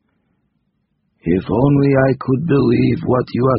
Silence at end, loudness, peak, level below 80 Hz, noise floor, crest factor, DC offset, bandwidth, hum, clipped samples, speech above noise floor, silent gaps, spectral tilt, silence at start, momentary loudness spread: 0 s; -15 LUFS; 0 dBFS; -42 dBFS; -67 dBFS; 16 dB; under 0.1%; 5.6 kHz; none; under 0.1%; 53 dB; none; -8 dB/octave; 1.25 s; 6 LU